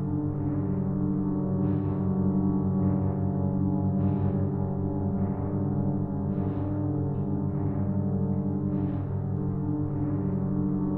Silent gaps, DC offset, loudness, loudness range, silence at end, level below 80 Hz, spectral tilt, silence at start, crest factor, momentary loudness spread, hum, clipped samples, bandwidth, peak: none; under 0.1%; -28 LUFS; 2 LU; 0 s; -46 dBFS; -13.5 dB/octave; 0 s; 12 dB; 3 LU; 50 Hz at -40 dBFS; under 0.1%; 2.5 kHz; -14 dBFS